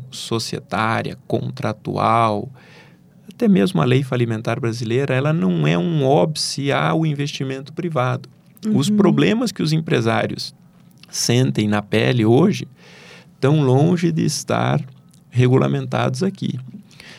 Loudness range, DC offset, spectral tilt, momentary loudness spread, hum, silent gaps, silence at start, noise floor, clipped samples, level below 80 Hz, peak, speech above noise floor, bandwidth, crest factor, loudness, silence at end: 2 LU; under 0.1%; -6 dB/octave; 11 LU; none; none; 0 s; -47 dBFS; under 0.1%; -58 dBFS; -2 dBFS; 29 dB; 15 kHz; 16 dB; -19 LUFS; 0 s